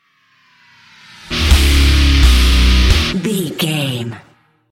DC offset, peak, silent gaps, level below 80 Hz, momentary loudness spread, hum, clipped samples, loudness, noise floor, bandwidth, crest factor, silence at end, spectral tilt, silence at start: under 0.1%; 0 dBFS; none; -14 dBFS; 10 LU; none; under 0.1%; -13 LUFS; -55 dBFS; 16 kHz; 14 dB; 0.55 s; -4.5 dB/octave; 1.25 s